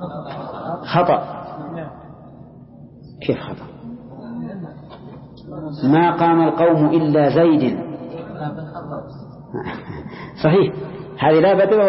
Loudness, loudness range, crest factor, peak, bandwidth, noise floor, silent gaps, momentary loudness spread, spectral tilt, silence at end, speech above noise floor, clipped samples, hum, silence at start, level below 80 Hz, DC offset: -18 LUFS; 14 LU; 18 dB; 0 dBFS; 5.8 kHz; -41 dBFS; none; 21 LU; -12 dB/octave; 0 s; 25 dB; under 0.1%; none; 0 s; -52 dBFS; under 0.1%